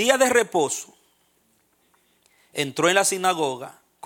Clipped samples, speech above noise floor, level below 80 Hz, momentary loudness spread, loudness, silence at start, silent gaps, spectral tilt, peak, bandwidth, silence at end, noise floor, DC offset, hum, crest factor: under 0.1%; 44 dB; -70 dBFS; 17 LU; -21 LUFS; 0 s; none; -2 dB/octave; -2 dBFS; 17.5 kHz; 0.35 s; -65 dBFS; under 0.1%; none; 22 dB